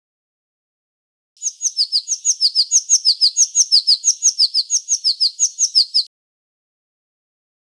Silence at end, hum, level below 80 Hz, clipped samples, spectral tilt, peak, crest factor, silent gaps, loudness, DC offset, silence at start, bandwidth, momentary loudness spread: 1.6 s; none; under -90 dBFS; under 0.1%; 15 dB/octave; -2 dBFS; 16 dB; none; -14 LUFS; under 0.1%; 1.4 s; 11 kHz; 7 LU